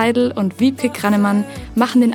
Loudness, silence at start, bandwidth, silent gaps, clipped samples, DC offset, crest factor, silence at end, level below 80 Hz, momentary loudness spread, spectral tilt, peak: -17 LUFS; 0 s; 17.5 kHz; none; under 0.1%; under 0.1%; 16 dB; 0 s; -46 dBFS; 5 LU; -6 dB/octave; 0 dBFS